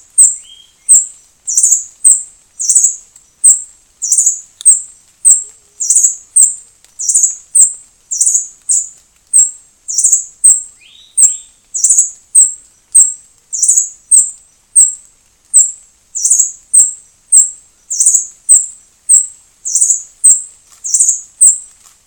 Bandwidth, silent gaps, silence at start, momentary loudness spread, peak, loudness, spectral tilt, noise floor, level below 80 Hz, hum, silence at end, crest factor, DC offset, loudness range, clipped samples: over 20 kHz; none; 0.15 s; 14 LU; 0 dBFS; -8 LUFS; 4 dB/octave; -48 dBFS; -60 dBFS; none; 0.4 s; 12 dB; under 0.1%; 2 LU; 2%